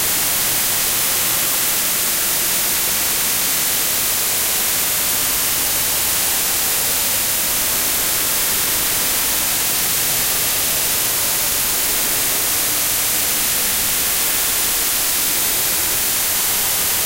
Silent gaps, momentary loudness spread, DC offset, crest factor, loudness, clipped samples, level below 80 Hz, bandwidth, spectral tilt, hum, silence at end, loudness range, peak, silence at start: none; 0 LU; under 0.1%; 14 dB; -15 LUFS; under 0.1%; -42 dBFS; 16.5 kHz; 0 dB/octave; none; 0 s; 0 LU; -4 dBFS; 0 s